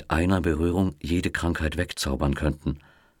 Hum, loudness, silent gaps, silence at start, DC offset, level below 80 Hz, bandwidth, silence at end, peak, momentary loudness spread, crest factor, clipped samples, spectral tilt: none; -26 LUFS; none; 0 s; under 0.1%; -34 dBFS; 16.5 kHz; 0.4 s; -8 dBFS; 6 LU; 18 dB; under 0.1%; -6 dB/octave